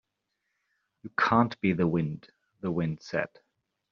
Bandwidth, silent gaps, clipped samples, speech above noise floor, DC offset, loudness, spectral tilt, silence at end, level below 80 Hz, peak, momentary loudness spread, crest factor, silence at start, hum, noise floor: 7 kHz; none; under 0.1%; 54 dB; under 0.1%; -28 LUFS; -6 dB/octave; 0.65 s; -62 dBFS; -8 dBFS; 14 LU; 22 dB; 1.05 s; none; -82 dBFS